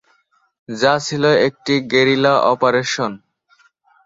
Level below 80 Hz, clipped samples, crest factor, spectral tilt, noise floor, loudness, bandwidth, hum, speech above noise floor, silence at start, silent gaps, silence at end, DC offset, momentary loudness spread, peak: -60 dBFS; under 0.1%; 16 dB; -4.5 dB/octave; -60 dBFS; -16 LUFS; 7.8 kHz; none; 44 dB; 0.7 s; none; 0.9 s; under 0.1%; 8 LU; -2 dBFS